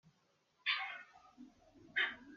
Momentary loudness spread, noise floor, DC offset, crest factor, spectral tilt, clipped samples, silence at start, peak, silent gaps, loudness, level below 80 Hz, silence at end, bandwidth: 23 LU; -77 dBFS; under 0.1%; 22 dB; 2.5 dB/octave; under 0.1%; 0.65 s; -22 dBFS; none; -39 LUFS; -82 dBFS; 0 s; 7.2 kHz